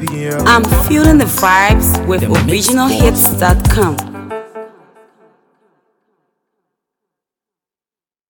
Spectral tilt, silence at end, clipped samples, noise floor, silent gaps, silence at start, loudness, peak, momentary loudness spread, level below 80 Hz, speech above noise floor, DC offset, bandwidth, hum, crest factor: -4.5 dB/octave; 3.6 s; under 0.1%; under -90 dBFS; none; 0 s; -11 LUFS; 0 dBFS; 17 LU; -22 dBFS; over 79 dB; under 0.1%; 19.5 kHz; none; 14 dB